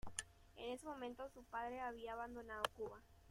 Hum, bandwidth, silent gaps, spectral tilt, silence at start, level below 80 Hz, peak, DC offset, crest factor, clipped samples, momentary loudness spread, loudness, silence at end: none; 16 kHz; none; -2.5 dB/octave; 0.05 s; -68 dBFS; -22 dBFS; under 0.1%; 28 dB; under 0.1%; 8 LU; -49 LUFS; 0 s